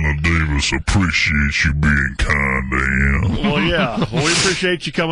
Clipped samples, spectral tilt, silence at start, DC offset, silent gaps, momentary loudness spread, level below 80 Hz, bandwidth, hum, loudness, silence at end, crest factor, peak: under 0.1%; -4.5 dB/octave; 0 s; under 0.1%; none; 3 LU; -24 dBFS; 11 kHz; none; -16 LUFS; 0 s; 12 dB; -4 dBFS